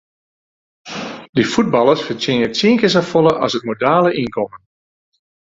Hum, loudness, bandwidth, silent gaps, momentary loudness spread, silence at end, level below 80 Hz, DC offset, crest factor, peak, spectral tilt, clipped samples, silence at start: none; -16 LUFS; 7.8 kHz; 1.29-1.33 s; 13 LU; 0.85 s; -54 dBFS; under 0.1%; 16 dB; 0 dBFS; -5.5 dB/octave; under 0.1%; 0.85 s